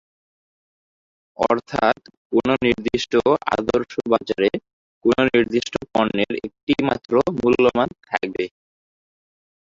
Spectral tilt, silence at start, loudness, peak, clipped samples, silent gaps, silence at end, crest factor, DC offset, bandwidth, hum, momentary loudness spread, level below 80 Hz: -5.5 dB/octave; 1.4 s; -21 LUFS; -2 dBFS; under 0.1%; 2.17-2.30 s, 4.73-5.01 s, 6.63-6.67 s; 1.15 s; 20 dB; under 0.1%; 7.6 kHz; none; 8 LU; -50 dBFS